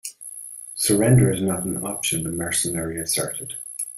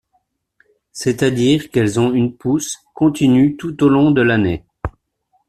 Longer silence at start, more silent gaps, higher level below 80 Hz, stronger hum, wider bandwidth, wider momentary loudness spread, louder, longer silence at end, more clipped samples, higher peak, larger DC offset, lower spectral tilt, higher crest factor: second, 0.05 s vs 0.95 s; neither; second, -50 dBFS vs -42 dBFS; neither; first, 16 kHz vs 13.5 kHz; first, 17 LU vs 13 LU; second, -22 LUFS vs -16 LUFS; second, 0 s vs 0.6 s; neither; about the same, -4 dBFS vs -2 dBFS; neither; second, -4.5 dB/octave vs -6 dB/octave; about the same, 18 dB vs 14 dB